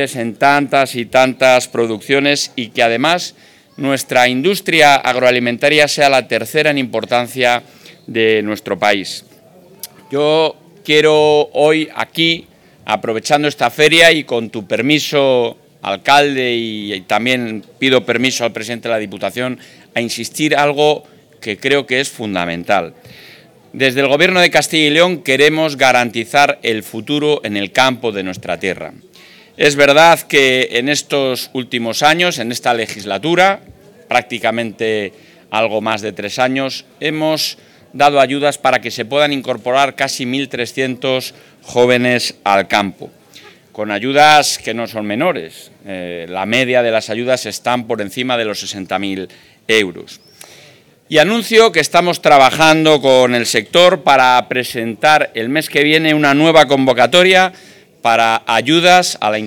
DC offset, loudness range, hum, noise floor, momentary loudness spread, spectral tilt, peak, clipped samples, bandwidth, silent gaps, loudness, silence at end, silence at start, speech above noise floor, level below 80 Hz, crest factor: under 0.1%; 6 LU; none; -45 dBFS; 12 LU; -3.5 dB/octave; 0 dBFS; under 0.1%; 19 kHz; none; -13 LUFS; 0 s; 0 s; 32 dB; -56 dBFS; 14 dB